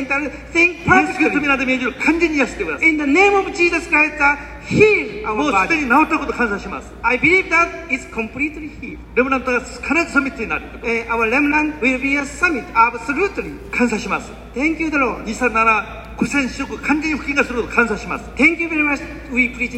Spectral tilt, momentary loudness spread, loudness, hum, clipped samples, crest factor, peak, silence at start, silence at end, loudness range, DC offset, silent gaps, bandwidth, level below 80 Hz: -5 dB/octave; 10 LU; -17 LUFS; none; under 0.1%; 18 dB; 0 dBFS; 0 s; 0 s; 4 LU; under 0.1%; none; 13.5 kHz; -38 dBFS